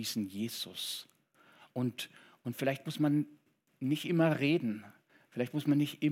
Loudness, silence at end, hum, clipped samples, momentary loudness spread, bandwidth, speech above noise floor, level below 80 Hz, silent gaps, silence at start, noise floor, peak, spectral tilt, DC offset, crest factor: -34 LUFS; 0 s; none; under 0.1%; 14 LU; 16.5 kHz; 32 dB; under -90 dBFS; none; 0 s; -65 dBFS; -16 dBFS; -5.5 dB/octave; under 0.1%; 18 dB